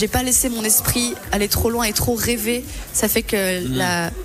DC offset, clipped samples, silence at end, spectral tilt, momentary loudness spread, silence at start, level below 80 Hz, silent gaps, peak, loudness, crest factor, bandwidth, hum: under 0.1%; under 0.1%; 0 s; -3 dB/octave; 6 LU; 0 s; -34 dBFS; none; -6 dBFS; -19 LUFS; 14 dB; 16 kHz; none